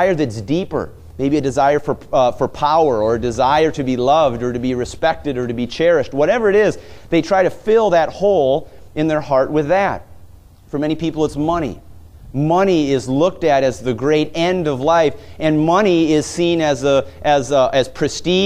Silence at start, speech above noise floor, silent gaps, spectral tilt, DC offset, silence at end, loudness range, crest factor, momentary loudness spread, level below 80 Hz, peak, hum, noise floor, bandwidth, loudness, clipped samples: 0 s; 26 dB; none; -5.5 dB/octave; under 0.1%; 0 s; 4 LU; 16 dB; 7 LU; -42 dBFS; -2 dBFS; none; -42 dBFS; 14 kHz; -17 LUFS; under 0.1%